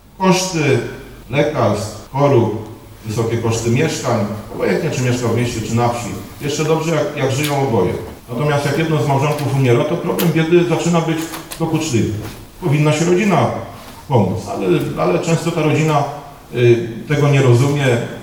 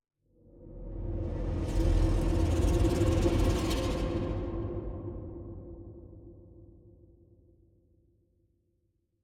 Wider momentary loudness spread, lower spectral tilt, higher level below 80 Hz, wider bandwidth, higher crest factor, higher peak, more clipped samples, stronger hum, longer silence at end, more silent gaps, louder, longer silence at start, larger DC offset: second, 11 LU vs 21 LU; about the same, -6 dB/octave vs -7 dB/octave; second, -44 dBFS vs -36 dBFS; first, 19 kHz vs 15 kHz; about the same, 16 dB vs 18 dB; first, 0 dBFS vs -14 dBFS; neither; neither; second, 0 s vs 2.6 s; neither; first, -17 LUFS vs -31 LUFS; second, 0.2 s vs 0.6 s; first, 0.2% vs under 0.1%